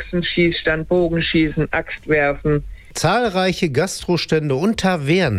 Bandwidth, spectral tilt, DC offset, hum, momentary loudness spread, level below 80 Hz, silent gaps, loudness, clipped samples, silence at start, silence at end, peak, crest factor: 15 kHz; -5.5 dB/octave; under 0.1%; none; 4 LU; -38 dBFS; none; -18 LUFS; under 0.1%; 0 s; 0 s; -4 dBFS; 14 dB